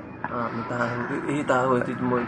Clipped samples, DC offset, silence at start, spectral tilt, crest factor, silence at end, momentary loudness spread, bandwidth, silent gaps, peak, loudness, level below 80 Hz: under 0.1%; under 0.1%; 0 s; -7 dB/octave; 18 dB; 0 s; 7 LU; 10 kHz; none; -6 dBFS; -26 LUFS; -58 dBFS